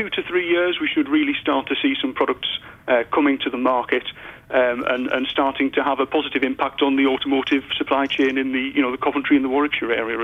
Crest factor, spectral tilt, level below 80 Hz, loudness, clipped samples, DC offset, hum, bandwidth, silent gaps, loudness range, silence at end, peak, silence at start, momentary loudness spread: 14 dB; -5.5 dB/octave; -56 dBFS; -20 LUFS; under 0.1%; under 0.1%; none; 6.2 kHz; none; 1 LU; 0 s; -6 dBFS; 0 s; 4 LU